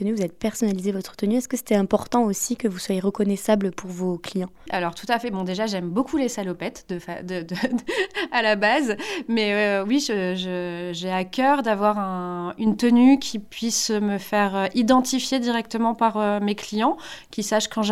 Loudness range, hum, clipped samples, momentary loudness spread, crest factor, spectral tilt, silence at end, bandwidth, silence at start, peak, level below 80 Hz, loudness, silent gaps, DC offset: 5 LU; none; under 0.1%; 10 LU; 18 dB; -4.5 dB/octave; 0 s; 15.5 kHz; 0 s; -6 dBFS; -56 dBFS; -23 LUFS; none; under 0.1%